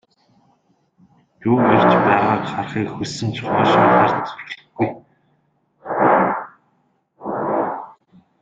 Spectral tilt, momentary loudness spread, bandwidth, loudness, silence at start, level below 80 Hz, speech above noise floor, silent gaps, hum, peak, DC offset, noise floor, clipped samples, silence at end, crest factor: -6.5 dB/octave; 19 LU; 9 kHz; -18 LUFS; 1.4 s; -56 dBFS; 48 dB; none; none; -2 dBFS; under 0.1%; -64 dBFS; under 0.1%; 0.55 s; 18 dB